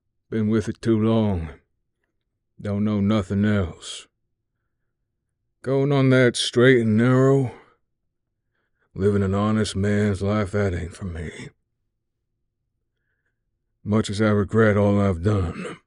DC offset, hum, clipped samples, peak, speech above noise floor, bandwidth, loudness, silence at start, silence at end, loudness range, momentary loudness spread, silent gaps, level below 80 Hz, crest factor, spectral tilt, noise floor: under 0.1%; none; under 0.1%; -4 dBFS; 56 dB; 11 kHz; -21 LUFS; 0.3 s; 0.1 s; 9 LU; 16 LU; none; -48 dBFS; 20 dB; -6.5 dB/octave; -77 dBFS